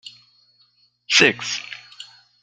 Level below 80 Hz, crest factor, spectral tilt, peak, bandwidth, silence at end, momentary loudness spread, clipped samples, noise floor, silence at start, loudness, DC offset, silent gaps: -68 dBFS; 22 dB; -1.5 dB/octave; -2 dBFS; 13 kHz; 0.4 s; 26 LU; under 0.1%; -61 dBFS; 0.05 s; -17 LUFS; under 0.1%; none